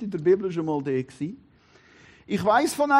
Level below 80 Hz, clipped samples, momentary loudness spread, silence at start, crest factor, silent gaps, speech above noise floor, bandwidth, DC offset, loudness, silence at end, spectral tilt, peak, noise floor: -64 dBFS; under 0.1%; 13 LU; 0 s; 18 dB; none; 33 dB; 14 kHz; under 0.1%; -25 LUFS; 0 s; -5.5 dB/octave; -8 dBFS; -56 dBFS